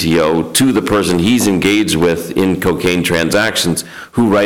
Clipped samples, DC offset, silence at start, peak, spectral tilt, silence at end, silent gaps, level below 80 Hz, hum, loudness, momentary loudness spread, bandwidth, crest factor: under 0.1%; 0.6%; 0 s; -2 dBFS; -4.5 dB/octave; 0 s; none; -38 dBFS; none; -13 LUFS; 4 LU; 19 kHz; 10 dB